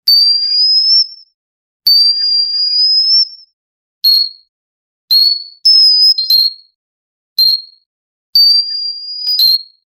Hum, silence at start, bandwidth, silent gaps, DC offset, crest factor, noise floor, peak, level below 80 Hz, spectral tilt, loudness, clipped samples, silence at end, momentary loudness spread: none; 0.05 s; over 20 kHz; 1.34-1.80 s, 3.53-4.01 s, 4.49-5.08 s, 6.75-7.36 s, 7.86-8.33 s; under 0.1%; 12 dB; under -90 dBFS; 0 dBFS; -64 dBFS; 3.5 dB/octave; -8 LUFS; under 0.1%; 0.35 s; 10 LU